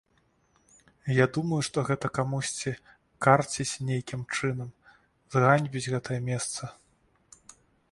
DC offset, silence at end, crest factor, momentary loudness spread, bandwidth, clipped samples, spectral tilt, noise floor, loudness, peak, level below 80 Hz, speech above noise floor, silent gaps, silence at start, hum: under 0.1%; 1.2 s; 26 dB; 14 LU; 11.5 kHz; under 0.1%; -5 dB/octave; -68 dBFS; -28 LUFS; -4 dBFS; -62 dBFS; 41 dB; none; 1.05 s; none